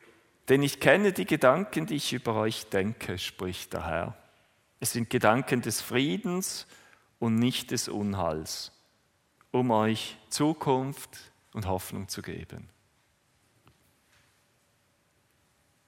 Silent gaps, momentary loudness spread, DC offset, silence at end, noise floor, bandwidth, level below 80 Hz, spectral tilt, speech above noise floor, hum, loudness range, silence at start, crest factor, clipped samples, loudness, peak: none; 16 LU; under 0.1%; 3.25 s; -69 dBFS; 16.5 kHz; -60 dBFS; -4.5 dB/octave; 41 dB; none; 13 LU; 0.45 s; 26 dB; under 0.1%; -29 LUFS; -4 dBFS